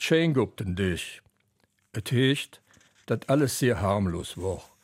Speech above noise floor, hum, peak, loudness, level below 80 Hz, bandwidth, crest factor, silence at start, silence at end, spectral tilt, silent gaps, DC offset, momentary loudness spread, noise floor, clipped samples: 44 dB; none; -10 dBFS; -27 LUFS; -52 dBFS; 16 kHz; 18 dB; 0 s; 0.2 s; -5.5 dB/octave; none; under 0.1%; 12 LU; -70 dBFS; under 0.1%